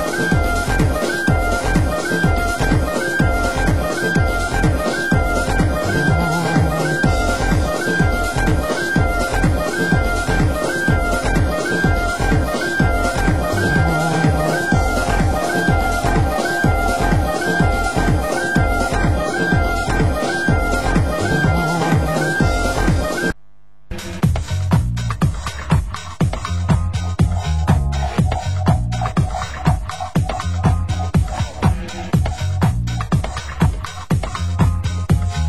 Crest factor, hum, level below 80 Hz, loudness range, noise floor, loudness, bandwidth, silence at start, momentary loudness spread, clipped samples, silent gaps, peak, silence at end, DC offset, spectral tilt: 16 dB; none; -24 dBFS; 3 LU; -56 dBFS; -18 LUFS; 16 kHz; 0 s; 4 LU; under 0.1%; none; 0 dBFS; 0 s; 2%; -6 dB/octave